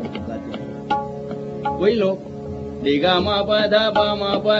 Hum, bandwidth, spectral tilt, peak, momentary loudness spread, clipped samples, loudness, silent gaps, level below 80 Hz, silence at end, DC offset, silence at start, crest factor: none; 7.6 kHz; -3 dB/octave; -2 dBFS; 14 LU; under 0.1%; -20 LUFS; none; -50 dBFS; 0 s; under 0.1%; 0 s; 18 dB